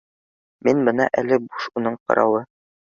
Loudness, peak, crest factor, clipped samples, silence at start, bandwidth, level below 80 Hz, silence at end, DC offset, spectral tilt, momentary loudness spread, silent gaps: -21 LUFS; -4 dBFS; 18 dB; under 0.1%; 0.65 s; 7.4 kHz; -64 dBFS; 0.55 s; under 0.1%; -6.5 dB/octave; 7 LU; 2.00-2.06 s